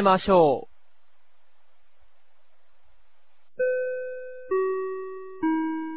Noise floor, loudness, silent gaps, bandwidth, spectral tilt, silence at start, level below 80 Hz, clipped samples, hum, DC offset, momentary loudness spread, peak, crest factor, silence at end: -70 dBFS; -25 LUFS; none; 4 kHz; -10 dB/octave; 0 s; -58 dBFS; under 0.1%; 50 Hz at -90 dBFS; 0.8%; 17 LU; -6 dBFS; 20 dB; 0 s